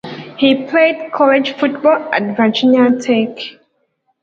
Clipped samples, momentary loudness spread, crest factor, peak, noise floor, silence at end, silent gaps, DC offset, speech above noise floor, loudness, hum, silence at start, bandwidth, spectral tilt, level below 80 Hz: under 0.1%; 9 LU; 14 dB; 0 dBFS; -64 dBFS; 0.7 s; none; under 0.1%; 51 dB; -14 LUFS; none; 0.05 s; 7.6 kHz; -5.5 dB/octave; -62 dBFS